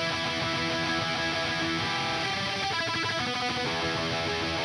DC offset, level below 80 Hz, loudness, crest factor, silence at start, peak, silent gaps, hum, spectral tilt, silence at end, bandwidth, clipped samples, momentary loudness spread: under 0.1%; -54 dBFS; -28 LUFS; 12 dB; 0 s; -16 dBFS; none; none; -3.5 dB/octave; 0 s; 15 kHz; under 0.1%; 1 LU